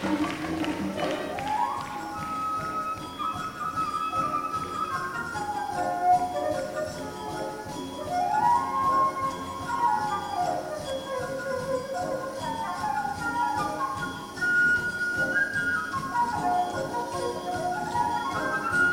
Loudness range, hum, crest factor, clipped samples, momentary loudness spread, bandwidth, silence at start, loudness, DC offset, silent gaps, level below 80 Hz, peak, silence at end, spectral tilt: 4 LU; none; 16 dB; under 0.1%; 9 LU; 17 kHz; 0 s; -28 LUFS; under 0.1%; none; -56 dBFS; -12 dBFS; 0 s; -4.5 dB/octave